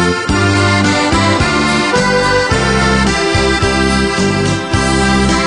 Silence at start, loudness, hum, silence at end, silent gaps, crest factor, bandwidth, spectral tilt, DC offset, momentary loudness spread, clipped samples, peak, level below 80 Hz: 0 s; -12 LUFS; none; 0 s; none; 12 dB; 10.5 kHz; -4.5 dB/octave; under 0.1%; 2 LU; under 0.1%; 0 dBFS; -24 dBFS